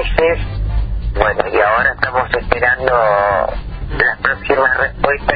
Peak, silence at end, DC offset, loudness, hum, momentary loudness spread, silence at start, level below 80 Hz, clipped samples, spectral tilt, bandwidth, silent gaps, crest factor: 0 dBFS; 0 s; under 0.1%; -15 LUFS; none; 8 LU; 0 s; -24 dBFS; under 0.1%; -8.5 dB/octave; 5 kHz; none; 14 dB